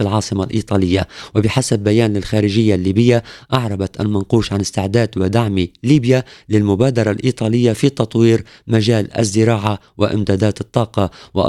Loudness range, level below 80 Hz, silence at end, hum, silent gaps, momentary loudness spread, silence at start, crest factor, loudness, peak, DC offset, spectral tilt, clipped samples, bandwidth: 1 LU; -44 dBFS; 0 s; none; none; 6 LU; 0 s; 16 dB; -16 LUFS; 0 dBFS; under 0.1%; -6.5 dB/octave; under 0.1%; 12.5 kHz